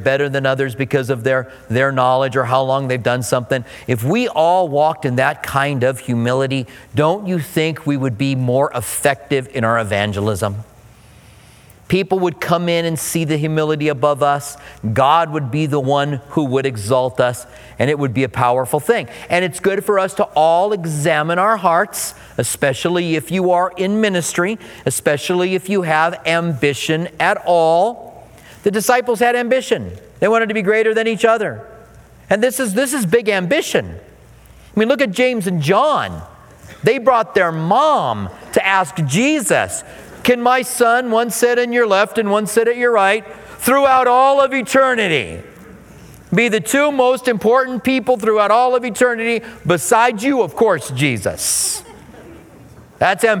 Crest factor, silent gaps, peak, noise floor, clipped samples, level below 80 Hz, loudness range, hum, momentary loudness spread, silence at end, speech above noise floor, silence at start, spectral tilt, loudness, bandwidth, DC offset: 16 dB; none; 0 dBFS; -44 dBFS; under 0.1%; -52 dBFS; 3 LU; none; 7 LU; 0 s; 28 dB; 0 s; -4.5 dB/octave; -16 LUFS; 19 kHz; under 0.1%